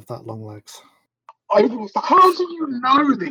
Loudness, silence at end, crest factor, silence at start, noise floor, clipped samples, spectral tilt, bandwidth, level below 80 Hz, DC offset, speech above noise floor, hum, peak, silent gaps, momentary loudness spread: -17 LUFS; 0 s; 16 dB; 0.1 s; -51 dBFS; under 0.1%; -5.5 dB/octave; 19 kHz; -68 dBFS; under 0.1%; 33 dB; none; -4 dBFS; none; 21 LU